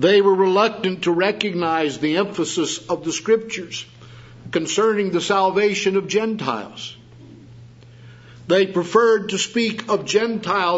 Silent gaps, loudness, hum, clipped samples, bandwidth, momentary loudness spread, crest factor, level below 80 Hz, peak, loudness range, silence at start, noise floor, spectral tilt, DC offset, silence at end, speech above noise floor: none; -20 LUFS; none; under 0.1%; 8 kHz; 12 LU; 18 dB; -60 dBFS; -2 dBFS; 3 LU; 0 s; -43 dBFS; -4 dB/octave; under 0.1%; 0 s; 24 dB